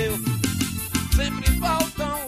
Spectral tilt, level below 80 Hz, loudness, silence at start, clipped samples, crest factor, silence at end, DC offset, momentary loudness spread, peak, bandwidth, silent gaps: -4.5 dB/octave; -28 dBFS; -24 LUFS; 0 s; under 0.1%; 18 dB; 0 s; under 0.1%; 3 LU; -6 dBFS; 15.5 kHz; none